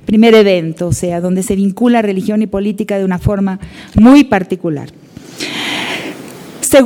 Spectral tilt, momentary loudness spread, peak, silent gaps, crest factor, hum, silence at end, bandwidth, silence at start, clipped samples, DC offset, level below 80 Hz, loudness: -5.5 dB/octave; 17 LU; 0 dBFS; none; 12 dB; none; 0 s; 19 kHz; 0.1 s; 0.5%; under 0.1%; -36 dBFS; -12 LUFS